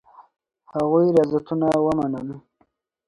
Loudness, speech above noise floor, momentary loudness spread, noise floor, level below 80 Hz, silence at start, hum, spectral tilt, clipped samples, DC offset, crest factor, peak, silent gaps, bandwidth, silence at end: -21 LUFS; 46 dB; 15 LU; -66 dBFS; -56 dBFS; 0.2 s; none; -8.5 dB/octave; under 0.1%; under 0.1%; 18 dB; -4 dBFS; none; 11 kHz; 0.7 s